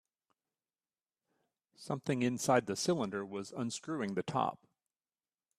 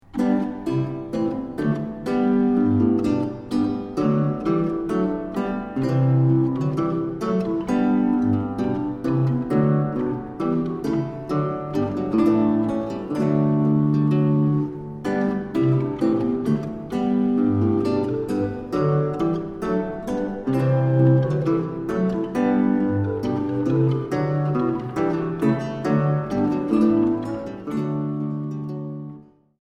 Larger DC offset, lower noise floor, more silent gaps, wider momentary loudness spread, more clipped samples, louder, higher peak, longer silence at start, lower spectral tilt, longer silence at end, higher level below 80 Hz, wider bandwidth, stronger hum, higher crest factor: neither; first, under -90 dBFS vs -44 dBFS; neither; first, 10 LU vs 7 LU; neither; second, -35 LUFS vs -22 LUFS; second, -14 dBFS vs -6 dBFS; first, 1.8 s vs 0.15 s; second, -5 dB/octave vs -9.5 dB/octave; first, 1.05 s vs 0.4 s; second, -76 dBFS vs -50 dBFS; first, 14 kHz vs 10 kHz; neither; first, 24 dB vs 16 dB